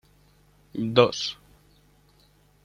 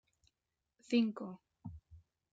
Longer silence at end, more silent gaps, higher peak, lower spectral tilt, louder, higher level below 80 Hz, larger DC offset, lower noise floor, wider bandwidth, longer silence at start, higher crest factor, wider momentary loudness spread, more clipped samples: first, 1.3 s vs 0.35 s; neither; first, -4 dBFS vs -22 dBFS; about the same, -5 dB/octave vs -6 dB/octave; first, -24 LUFS vs -36 LUFS; first, -62 dBFS vs -70 dBFS; neither; second, -60 dBFS vs -89 dBFS; first, 11 kHz vs 7.8 kHz; second, 0.75 s vs 0.9 s; first, 26 dB vs 20 dB; about the same, 19 LU vs 20 LU; neither